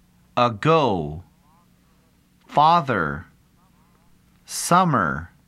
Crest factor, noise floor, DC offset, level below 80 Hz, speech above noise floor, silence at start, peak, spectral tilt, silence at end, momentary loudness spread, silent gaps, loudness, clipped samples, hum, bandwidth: 20 dB; -59 dBFS; under 0.1%; -50 dBFS; 39 dB; 0.35 s; -4 dBFS; -5 dB/octave; 0.2 s; 15 LU; none; -20 LUFS; under 0.1%; none; 15.5 kHz